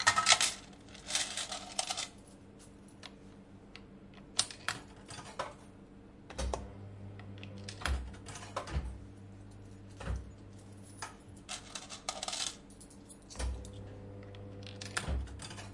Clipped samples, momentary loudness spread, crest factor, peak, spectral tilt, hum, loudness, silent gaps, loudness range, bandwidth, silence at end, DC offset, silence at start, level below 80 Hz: under 0.1%; 20 LU; 32 dB; -8 dBFS; -1.5 dB/octave; none; -37 LUFS; none; 5 LU; 11.5 kHz; 0 s; under 0.1%; 0 s; -48 dBFS